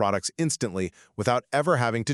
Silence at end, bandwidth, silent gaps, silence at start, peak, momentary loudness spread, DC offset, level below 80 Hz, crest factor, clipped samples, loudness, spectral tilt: 0 s; 13 kHz; none; 0 s; -6 dBFS; 7 LU; under 0.1%; -62 dBFS; 18 dB; under 0.1%; -26 LUFS; -4.5 dB/octave